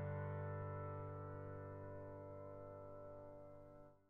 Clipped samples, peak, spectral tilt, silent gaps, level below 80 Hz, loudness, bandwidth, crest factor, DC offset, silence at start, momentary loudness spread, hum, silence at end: under 0.1%; -36 dBFS; -9.5 dB/octave; none; -70 dBFS; -52 LUFS; 3.4 kHz; 14 dB; under 0.1%; 0 s; 12 LU; none; 0.05 s